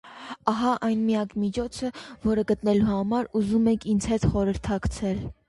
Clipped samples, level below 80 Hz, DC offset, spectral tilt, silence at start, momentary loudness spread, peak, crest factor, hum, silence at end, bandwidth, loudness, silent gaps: under 0.1%; -42 dBFS; under 0.1%; -6.5 dB/octave; 0.05 s; 7 LU; -6 dBFS; 18 dB; none; 0.15 s; 11.5 kHz; -25 LUFS; none